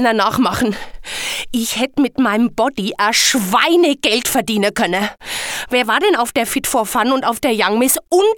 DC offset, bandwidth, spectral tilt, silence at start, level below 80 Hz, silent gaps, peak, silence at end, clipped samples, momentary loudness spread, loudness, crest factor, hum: under 0.1%; 19.5 kHz; -2.5 dB/octave; 0 s; -46 dBFS; none; 0 dBFS; 0 s; under 0.1%; 8 LU; -16 LUFS; 16 dB; none